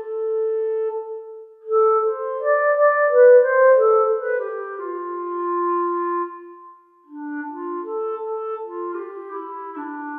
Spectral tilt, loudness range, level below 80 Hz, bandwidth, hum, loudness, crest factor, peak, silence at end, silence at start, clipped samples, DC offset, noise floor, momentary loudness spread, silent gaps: -7 dB/octave; 13 LU; under -90 dBFS; 2.8 kHz; none; -20 LUFS; 16 dB; -4 dBFS; 0 s; 0 s; under 0.1%; under 0.1%; -47 dBFS; 18 LU; none